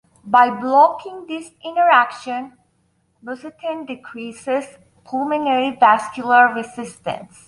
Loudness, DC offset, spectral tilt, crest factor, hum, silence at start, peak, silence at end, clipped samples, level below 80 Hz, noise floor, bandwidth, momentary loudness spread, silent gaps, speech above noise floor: -17 LUFS; under 0.1%; -4 dB/octave; 18 dB; none; 0.25 s; -2 dBFS; 0.25 s; under 0.1%; -66 dBFS; -64 dBFS; 11.5 kHz; 18 LU; none; 46 dB